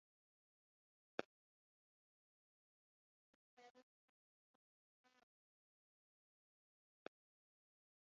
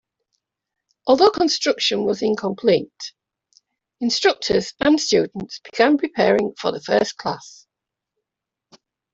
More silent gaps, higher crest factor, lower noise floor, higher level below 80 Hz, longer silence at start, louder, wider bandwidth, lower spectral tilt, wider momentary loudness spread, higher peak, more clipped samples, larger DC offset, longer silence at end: first, 1.25-3.57 s, 3.70-3.75 s vs none; first, 42 dB vs 18 dB; first, under -90 dBFS vs -85 dBFS; second, under -90 dBFS vs -58 dBFS; first, 1.2 s vs 1.05 s; second, -56 LUFS vs -19 LUFS; second, 6.8 kHz vs 8 kHz; second, -2 dB/octave vs -4 dB/octave; first, 16 LU vs 13 LU; second, -24 dBFS vs -2 dBFS; neither; neither; first, 4.2 s vs 1.65 s